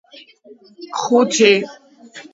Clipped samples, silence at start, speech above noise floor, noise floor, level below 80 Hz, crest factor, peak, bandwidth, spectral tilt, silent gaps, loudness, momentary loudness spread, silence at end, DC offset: under 0.1%; 0.15 s; 23 dB; -41 dBFS; -72 dBFS; 18 dB; 0 dBFS; 8 kHz; -3 dB/octave; none; -15 LUFS; 16 LU; 0.1 s; under 0.1%